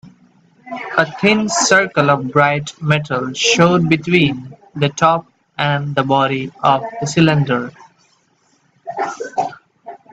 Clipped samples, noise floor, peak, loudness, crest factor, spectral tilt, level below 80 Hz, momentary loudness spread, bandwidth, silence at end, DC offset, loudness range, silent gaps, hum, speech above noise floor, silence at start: under 0.1%; -59 dBFS; 0 dBFS; -16 LUFS; 16 dB; -4.5 dB/octave; -54 dBFS; 13 LU; 9.2 kHz; 0.15 s; under 0.1%; 5 LU; none; none; 43 dB; 0.05 s